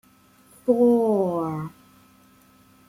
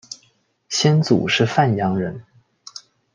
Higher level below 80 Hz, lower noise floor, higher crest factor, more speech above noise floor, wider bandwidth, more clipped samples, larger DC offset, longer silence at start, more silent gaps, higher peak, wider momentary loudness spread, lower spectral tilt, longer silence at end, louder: second, -66 dBFS vs -60 dBFS; second, -56 dBFS vs -61 dBFS; about the same, 16 dB vs 18 dB; second, 35 dB vs 44 dB; first, 15.5 kHz vs 9.8 kHz; neither; neither; first, 0.65 s vs 0.1 s; neither; second, -8 dBFS vs -2 dBFS; second, 14 LU vs 21 LU; first, -9 dB/octave vs -5 dB/octave; first, 1.2 s vs 0.35 s; second, -22 LUFS vs -18 LUFS